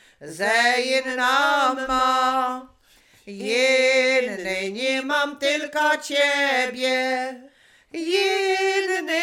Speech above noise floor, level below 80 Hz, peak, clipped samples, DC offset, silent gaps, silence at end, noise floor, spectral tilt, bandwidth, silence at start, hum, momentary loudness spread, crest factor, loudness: 34 dB; -58 dBFS; -6 dBFS; under 0.1%; under 0.1%; none; 0 s; -56 dBFS; -1.5 dB/octave; 17.5 kHz; 0.2 s; none; 9 LU; 16 dB; -21 LUFS